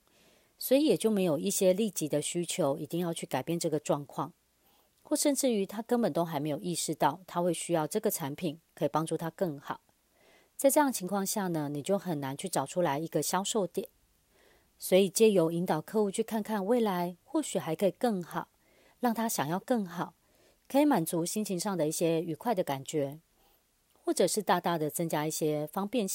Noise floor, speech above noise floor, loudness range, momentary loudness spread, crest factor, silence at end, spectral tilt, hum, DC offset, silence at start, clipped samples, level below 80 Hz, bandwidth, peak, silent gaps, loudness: -69 dBFS; 39 dB; 4 LU; 9 LU; 20 dB; 0 s; -4.5 dB/octave; none; under 0.1%; 0.6 s; under 0.1%; -76 dBFS; 16.5 kHz; -12 dBFS; none; -31 LUFS